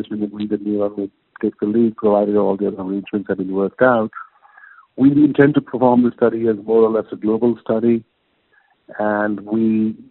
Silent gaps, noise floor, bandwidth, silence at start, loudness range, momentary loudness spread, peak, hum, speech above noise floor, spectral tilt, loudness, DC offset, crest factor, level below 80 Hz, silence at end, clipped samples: none; -60 dBFS; 4.2 kHz; 0 s; 4 LU; 10 LU; 0 dBFS; none; 43 dB; -7 dB/octave; -18 LUFS; under 0.1%; 18 dB; -58 dBFS; 0.1 s; under 0.1%